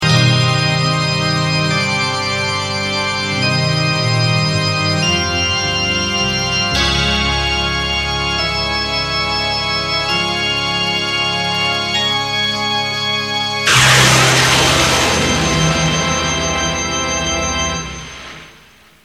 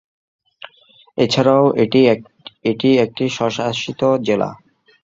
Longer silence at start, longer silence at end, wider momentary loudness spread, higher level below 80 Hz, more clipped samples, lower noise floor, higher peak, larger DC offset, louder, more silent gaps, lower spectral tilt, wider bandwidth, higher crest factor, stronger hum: second, 0 s vs 1.15 s; about the same, 0.55 s vs 0.5 s; second, 6 LU vs 9 LU; first, -32 dBFS vs -56 dBFS; neither; second, -45 dBFS vs -51 dBFS; about the same, 0 dBFS vs 0 dBFS; first, 0.1% vs under 0.1%; first, -14 LUFS vs -17 LUFS; neither; second, -3 dB/octave vs -6 dB/octave; first, 15.5 kHz vs 7.8 kHz; about the same, 16 dB vs 16 dB; neither